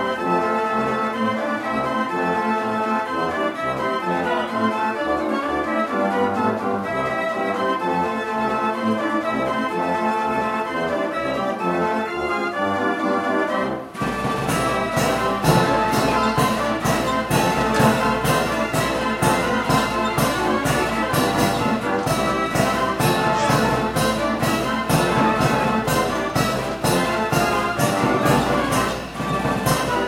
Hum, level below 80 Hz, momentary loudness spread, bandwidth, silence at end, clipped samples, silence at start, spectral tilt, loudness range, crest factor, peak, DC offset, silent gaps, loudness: none; -42 dBFS; 5 LU; 16 kHz; 0 s; under 0.1%; 0 s; -5 dB/octave; 3 LU; 18 dB; -4 dBFS; under 0.1%; none; -21 LUFS